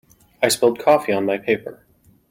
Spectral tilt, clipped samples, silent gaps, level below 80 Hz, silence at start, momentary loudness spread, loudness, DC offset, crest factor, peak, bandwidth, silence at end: -3.5 dB/octave; under 0.1%; none; -62 dBFS; 0.4 s; 7 LU; -19 LUFS; under 0.1%; 18 dB; -2 dBFS; 16.5 kHz; 0.55 s